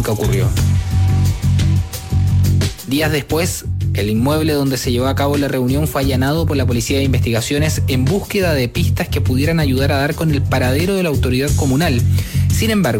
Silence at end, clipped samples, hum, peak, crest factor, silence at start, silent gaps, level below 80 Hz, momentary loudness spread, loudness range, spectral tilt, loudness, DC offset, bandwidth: 0 s; under 0.1%; none; -6 dBFS; 10 dB; 0 s; none; -28 dBFS; 3 LU; 1 LU; -6 dB/octave; -16 LUFS; under 0.1%; 17 kHz